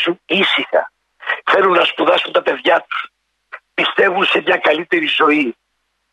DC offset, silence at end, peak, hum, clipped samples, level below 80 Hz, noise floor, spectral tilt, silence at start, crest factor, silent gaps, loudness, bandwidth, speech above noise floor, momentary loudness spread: under 0.1%; 0.6 s; -2 dBFS; none; under 0.1%; -66 dBFS; -39 dBFS; -4.5 dB/octave; 0 s; 14 dB; none; -15 LUFS; 11 kHz; 24 dB; 11 LU